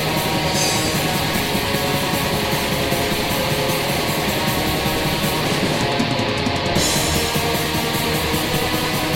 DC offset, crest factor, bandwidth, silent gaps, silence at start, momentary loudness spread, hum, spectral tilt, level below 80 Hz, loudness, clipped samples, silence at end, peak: under 0.1%; 14 dB; 16.5 kHz; none; 0 s; 2 LU; none; -3.5 dB/octave; -36 dBFS; -19 LUFS; under 0.1%; 0 s; -6 dBFS